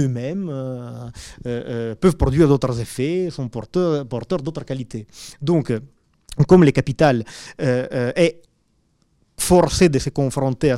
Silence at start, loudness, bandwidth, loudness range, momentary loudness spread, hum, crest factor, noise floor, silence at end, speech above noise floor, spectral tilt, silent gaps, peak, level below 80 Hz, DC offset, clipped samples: 0 s; -20 LUFS; 15 kHz; 5 LU; 16 LU; none; 16 dB; -64 dBFS; 0 s; 45 dB; -6.5 dB/octave; none; -4 dBFS; -38 dBFS; under 0.1%; under 0.1%